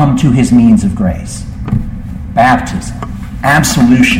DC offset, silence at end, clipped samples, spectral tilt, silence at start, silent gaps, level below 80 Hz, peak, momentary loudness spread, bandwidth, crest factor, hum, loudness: under 0.1%; 0 s; under 0.1%; -5.5 dB/octave; 0 s; none; -24 dBFS; 0 dBFS; 16 LU; 16.5 kHz; 10 dB; none; -10 LUFS